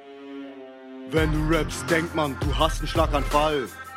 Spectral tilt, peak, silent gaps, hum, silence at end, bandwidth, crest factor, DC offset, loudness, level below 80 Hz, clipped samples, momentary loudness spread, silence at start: -5 dB/octave; -6 dBFS; none; none; 0 s; 16.5 kHz; 20 dB; under 0.1%; -24 LUFS; -32 dBFS; under 0.1%; 18 LU; 0 s